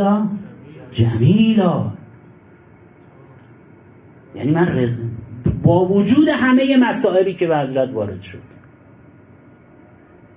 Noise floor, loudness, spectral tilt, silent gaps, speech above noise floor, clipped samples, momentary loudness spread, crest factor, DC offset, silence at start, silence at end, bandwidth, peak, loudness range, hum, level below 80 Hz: -46 dBFS; -17 LUFS; -11.5 dB/octave; none; 30 dB; under 0.1%; 17 LU; 16 dB; under 0.1%; 0 s; 1.9 s; 4 kHz; -2 dBFS; 8 LU; none; -44 dBFS